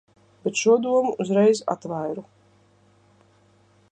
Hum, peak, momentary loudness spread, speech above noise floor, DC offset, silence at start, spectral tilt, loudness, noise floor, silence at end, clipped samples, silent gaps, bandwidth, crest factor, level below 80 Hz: 50 Hz at -45 dBFS; -6 dBFS; 12 LU; 37 dB; under 0.1%; 0.45 s; -5 dB/octave; -22 LUFS; -59 dBFS; 1.7 s; under 0.1%; none; 9.6 kHz; 18 dB; -72 dBFS